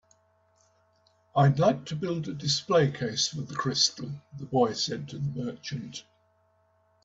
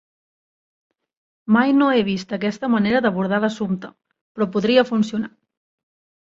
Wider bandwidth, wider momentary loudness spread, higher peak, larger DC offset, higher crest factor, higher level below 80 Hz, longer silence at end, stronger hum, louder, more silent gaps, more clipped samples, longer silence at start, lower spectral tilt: about the same, 8 kHz vs 7.6 kHz; about the same, 14 LU vs 12 LU; second, -10 dBFS vs -2 dBFS; neither; about the same, 20 dB vs 20 dB; about the same, -64 dBFS vs -60 dBFS; about the same, 1.05 s vs 0.95 s; neither; second, -27 LUFS vs -20 LUFS; second, none vs 4.21-4.35 s; neither; second, 1.35 s vs 1.5 s; second, -4.5 dB/octave vs -6.5 dB/octave